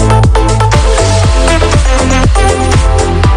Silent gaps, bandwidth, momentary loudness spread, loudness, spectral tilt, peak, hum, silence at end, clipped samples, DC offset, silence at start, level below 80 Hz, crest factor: none; 10.5 kHz; 1 LU; -9 LUFS; -5 dB/octave; 0 dBFS; none; 0 s; 1%; under 0.1%; 0 s; -12 dBFS; 6 dB